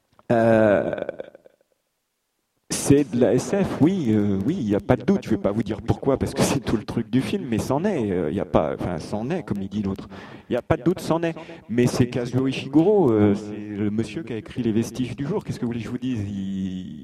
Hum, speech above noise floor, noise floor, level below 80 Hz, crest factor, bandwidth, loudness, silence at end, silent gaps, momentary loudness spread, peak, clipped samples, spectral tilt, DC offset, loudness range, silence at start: none; 53 dB; -75 dBFS; -48 dBFS; 22 dB; 14.5 kHz; -23 LUFS; 0 s; none; 11 LU; 0 dBFS; under 0.1%; -6.5 dB/octave; under 0.1%; 4 LU; 0.3 s